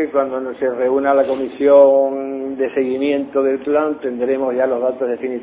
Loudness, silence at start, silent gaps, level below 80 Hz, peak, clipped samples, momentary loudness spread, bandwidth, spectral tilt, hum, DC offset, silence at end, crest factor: -17 LUFS; 0 s; none; -60 dBFS; -2 dBFS; under 0.1%; 10 LU; 4 kHz; -9.5 dB/octave; none; under 0.1%; 0 s; 16 dB